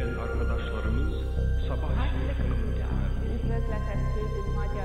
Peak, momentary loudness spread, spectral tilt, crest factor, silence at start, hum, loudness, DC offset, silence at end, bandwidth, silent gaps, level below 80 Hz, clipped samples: -16 dBFS; 2 LU; -8 dB/octave; 12 dB; 0 s; none; -30 LUFS; 0.2%; 0 s; 6.6 kHz; none; -28 dBFS; under 0.1%